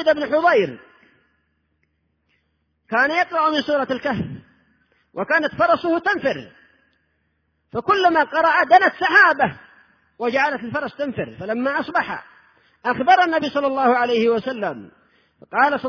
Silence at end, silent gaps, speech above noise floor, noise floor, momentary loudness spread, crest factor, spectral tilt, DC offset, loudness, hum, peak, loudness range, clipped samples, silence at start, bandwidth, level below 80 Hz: 0 s; none; 50 dB; -69 dBFS; 14 LU; 20 dB; -5.5 dB/octave; under 0.1%; -19 LUFS; none; -2 dBFS; 6 LU; under 0.1%; 0 s; 5.4 kHz; -60 dBFS